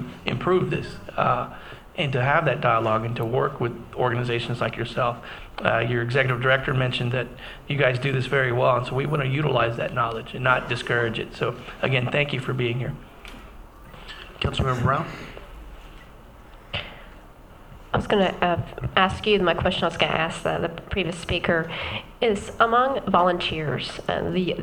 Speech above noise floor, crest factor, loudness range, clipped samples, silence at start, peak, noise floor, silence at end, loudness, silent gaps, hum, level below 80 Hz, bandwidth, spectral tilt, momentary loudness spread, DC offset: 22 dB; 24 dB; 7 LU; under 0.1%; 0 s; 0 dBFS; -46 dBFS; 0 s; -24 LUFS; none; none; -44 dBFS; 18.5 kHz; -6 dB/octave; 14 LU; under 0.1%